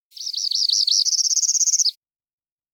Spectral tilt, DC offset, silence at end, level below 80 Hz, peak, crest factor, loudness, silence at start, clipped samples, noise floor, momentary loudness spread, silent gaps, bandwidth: 14.5 dB/octave; under 0.1%; 0.8 s; under -90 dBFS; -6 dBFS; 16 dB; -17 LUFS; 0.15 s; under 0.1%; under -90 dBFS; 6 LU; none; 18 kHz